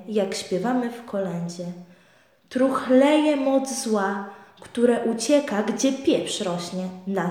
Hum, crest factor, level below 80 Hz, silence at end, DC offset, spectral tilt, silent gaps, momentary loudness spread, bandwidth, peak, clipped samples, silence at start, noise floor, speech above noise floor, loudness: none; 16 dB; -70 dBFS; 0 s; under 0.1%; -4.5 dB/octave; none; 14 LU; 15.5 kHz; -6 dBFS; under 0.1%; 0 s; -58 dBFS; 35 dB; -23 LUFS